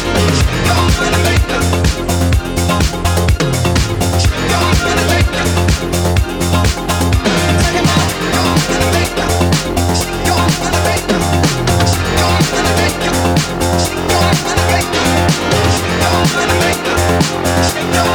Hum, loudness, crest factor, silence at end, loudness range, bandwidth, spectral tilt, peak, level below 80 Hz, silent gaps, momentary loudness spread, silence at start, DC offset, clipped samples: none; -13 LUFS; 12 dB; 0 s; 1 LU; over 20 kHz; -4.5 dB/octave; 0 dBFS; -22 dBFS; none; 2 LU; 0 s; under 0.1%; under 0.1%